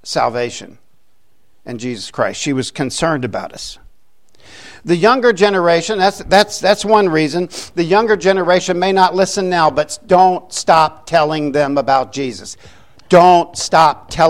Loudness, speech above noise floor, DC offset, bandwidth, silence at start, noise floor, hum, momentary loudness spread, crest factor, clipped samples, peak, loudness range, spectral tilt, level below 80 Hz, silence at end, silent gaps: -14 LUFS; 49 dB; 0.7%; 16 kHz; 0.05 s; -63 dBFS; none; 13 LU; 14 dB; under 0.1%; 0 dBFS; 8 LU; -4.5 dB/octave; -46 dBFS; 0 s; none